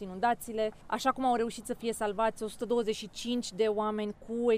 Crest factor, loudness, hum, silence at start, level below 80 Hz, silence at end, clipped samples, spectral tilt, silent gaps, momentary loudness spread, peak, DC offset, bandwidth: 18 dB; -32 LUFS; none; 0 s; -58 dBFS; 0 s; under 0.1%; -4 dB/octave; none; 7 LU; -14 dBFS; under 0.1%; 15.5 kHz